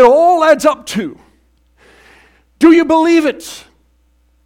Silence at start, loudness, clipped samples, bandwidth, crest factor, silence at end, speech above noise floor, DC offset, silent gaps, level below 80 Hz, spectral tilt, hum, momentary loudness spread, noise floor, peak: 0 s; -11 LUFS; 0.2%; 15.5 kHz; 12 dB; 0.85 s; 43 dB; under 0.1%; none; -50 dBFS; -4.5 dB/octave; none; 19 LU; -55 dBFS; 0 dBFS